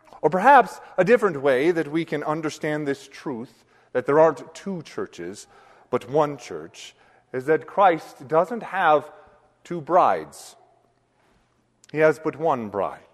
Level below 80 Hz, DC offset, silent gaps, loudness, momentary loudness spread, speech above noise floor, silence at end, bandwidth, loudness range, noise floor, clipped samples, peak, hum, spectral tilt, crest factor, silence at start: -68 dBFS; under 0.1%; none; -22 LUFS; 17 LU; 42 dB; 0.15 s; 13 kHz; 5 LU; -64 dBFS; under 0.1%; -2 dBFS; none; -6 dB/octave; 20 dB; 0.15 s